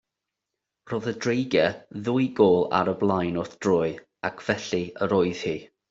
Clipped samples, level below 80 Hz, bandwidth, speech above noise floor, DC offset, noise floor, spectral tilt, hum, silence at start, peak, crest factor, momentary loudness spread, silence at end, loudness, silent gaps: under 0.1%; -62 dBFS; 7.8 kHz; 61 dB; under 0.1%; -85 dBFS; -6 dB/octave; none; 0.85 s; -6 dBFS; 20 dB; 11 LU; 0.25 s; -25 LUFS; none